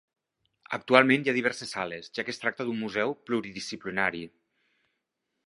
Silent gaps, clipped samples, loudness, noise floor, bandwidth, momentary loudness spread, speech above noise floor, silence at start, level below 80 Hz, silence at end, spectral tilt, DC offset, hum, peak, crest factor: none; under 0.1%; -28 LUFS; -82 dBFS; 11.5 kHz; 15 LU; 54 dB; 0.7 s; -70 dBFS; 1.2 s; -4.5 dB/octave; under 0.1%; none; -2 dBFS; 28 dB